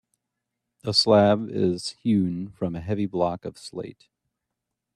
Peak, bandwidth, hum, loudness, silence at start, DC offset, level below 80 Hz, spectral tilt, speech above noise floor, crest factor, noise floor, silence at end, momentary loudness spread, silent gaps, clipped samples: -6 dBFS; 12 kHz; none; -23 LUFS; 0.85 s; under 0.1%; -60 dBFS; -5.5 dB/octave; 60 dB; 20 dB; -83 dBFS; 1.05 s; 18 LU; none; under 0.1%